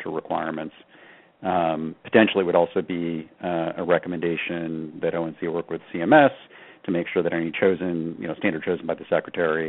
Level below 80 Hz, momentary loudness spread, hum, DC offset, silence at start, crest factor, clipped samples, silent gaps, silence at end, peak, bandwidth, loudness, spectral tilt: -64 dBFS; 12 LU; none; under 0.1%; 0 s; 22 dB; under 0.1%; none; 0 s; -2 dBFS; 4.1 kHz; -24 LUFS; -4.5 dB/octave